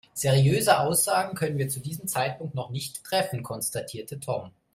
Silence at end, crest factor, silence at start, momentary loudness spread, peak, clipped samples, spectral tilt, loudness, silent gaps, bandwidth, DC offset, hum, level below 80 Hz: 0.25 s; 22 dB; 0.15 s; 13 LU; -4 dBFS; under 0.1%; -4.5 dB/octave; -26 LUFS; none; 16 kHz; under 0.1%; none; -60 dBFS